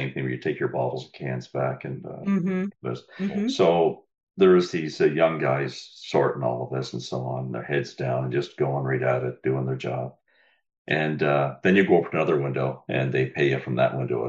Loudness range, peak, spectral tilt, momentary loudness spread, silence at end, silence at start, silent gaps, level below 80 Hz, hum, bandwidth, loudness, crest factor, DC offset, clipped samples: 5 LU; -6 dBFS; -7 dB/octave; 12 LU; 0 s; 0 s; 4.23-4.27 s, 10.78-10.85 s; -66 dBFS; none; 7.8 kHz; -25 LUFS; 18 dB; under 0.1%; under 0.1%